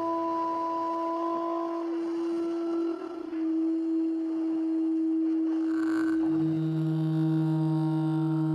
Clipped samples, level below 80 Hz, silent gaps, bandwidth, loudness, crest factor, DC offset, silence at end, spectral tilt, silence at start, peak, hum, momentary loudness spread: under 0.1%; -74 dBFS; none; 5.8 kHz; -29 LUFS; 10 dB; under 0.1%; 0 s; -9.5 dB/octave; 0 s; -18 dBFS; none; 4 LU